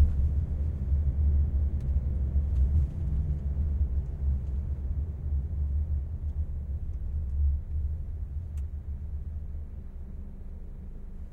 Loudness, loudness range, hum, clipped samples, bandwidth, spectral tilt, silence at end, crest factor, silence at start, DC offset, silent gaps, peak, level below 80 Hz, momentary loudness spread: -32 LUFS; 8 LU; none; under 0.1%; 1.8 kHz; -11 dB/octave; 0 s; 16 dB; 0 s; under 0.1%; none; -12 dBFS; -30 dBFS; 16 LU